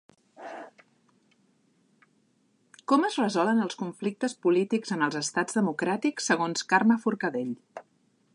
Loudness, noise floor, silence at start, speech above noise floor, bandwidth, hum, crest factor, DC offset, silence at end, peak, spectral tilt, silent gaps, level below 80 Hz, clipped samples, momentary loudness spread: -27 LUFS; -68 dBFS; 0.4 s; 42 dB; 11 kHz; none; 20 dB; under 0.1%; 0.55 s; -8 dBFS; -4.5 dB/octave; none; -82 dBFS; under 0.1%; 19 LU